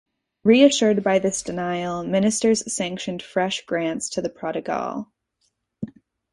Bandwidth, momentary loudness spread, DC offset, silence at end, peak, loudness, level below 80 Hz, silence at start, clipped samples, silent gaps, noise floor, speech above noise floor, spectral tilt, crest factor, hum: 11.5 kHz; 17 LU; under 0.1%; 0.4 s; -2 dBFS; -22 LUFS; -60 dBFS; 0.45 s; under 0.1%; none; -72 dBFS; 50 dB; -4 dB/octave; 20 dB; none